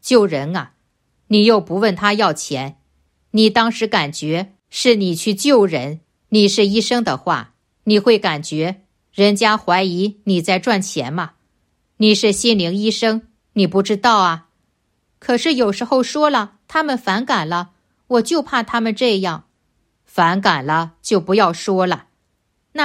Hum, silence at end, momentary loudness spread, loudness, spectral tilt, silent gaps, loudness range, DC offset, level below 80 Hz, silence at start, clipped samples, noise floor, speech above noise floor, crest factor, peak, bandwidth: none; 0 s; 12 LU; -17 LUFS; -4.5 dB/octave; none; 2 LU; under 0.1%; -58 dBFS; 0.05 s; under 0.1%; -67 dBFS; 51 dB; 16 dB; 0 dBFS; 15 kHz